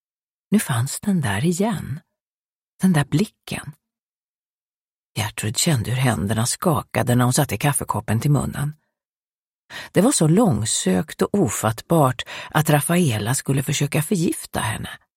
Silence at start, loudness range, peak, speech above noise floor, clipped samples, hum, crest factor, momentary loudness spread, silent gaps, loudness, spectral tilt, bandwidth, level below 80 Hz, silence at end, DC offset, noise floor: 0.5 s; 6 LU; 0 dBFS; over 70 dB; under 0.1%; none; 20 dB; 11 LU; 2.21-2.79 s, 3.99-5.15 s, 9.12-9.69 s; -21 LUFS; -5 dB/octave; 16.5 kHz; -50 dBFS; 0.2 s; under 0.1%; under -90 dBFS